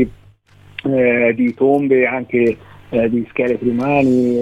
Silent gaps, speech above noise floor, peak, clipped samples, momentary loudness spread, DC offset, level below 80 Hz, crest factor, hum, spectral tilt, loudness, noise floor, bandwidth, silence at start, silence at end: none; 32 dB; -2 dBFS; under 0.1%; 8 LU; 0.2%; -48 dBFS; 14 dB; none; -8.5 dB/octave; -16 LUFS; -47 dBFS; 8 kHz; 0 s; 0 s